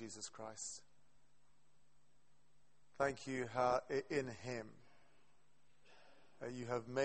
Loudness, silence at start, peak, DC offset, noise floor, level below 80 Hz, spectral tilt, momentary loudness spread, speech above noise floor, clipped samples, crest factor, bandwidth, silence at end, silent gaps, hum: -43 LUFS; 0 s; -24 dBFS; under 0.1%; -78 dBFS; -74 dBFS; -4.5 dB/octave; 13 LU; 36 dB; under 0.1%; 22 dB; 8.4 kHz; 0 s; none; none